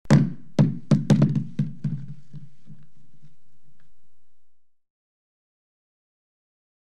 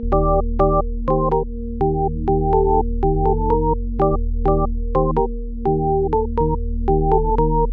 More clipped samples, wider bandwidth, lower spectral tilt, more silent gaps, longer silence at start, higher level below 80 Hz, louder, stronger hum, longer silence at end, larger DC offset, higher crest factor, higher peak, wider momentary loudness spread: neither; first, 9.4 kHz vs 3 kHz; second, -8 dB/octave vs -12.5 dB/octave; neither; about the same, 0.1 s vs 0 s; second, -50 dBFS vs -22 dBFS; second, -23 LUFS vs -20 LUFS; neither; first, 1.95 s vs 0 s; first, 2% vs under 0.1%; first, 20 dB vs 14 dB; about the same, -6 dBFS vs -4 dBFS; first, 23 LU vs 4 LU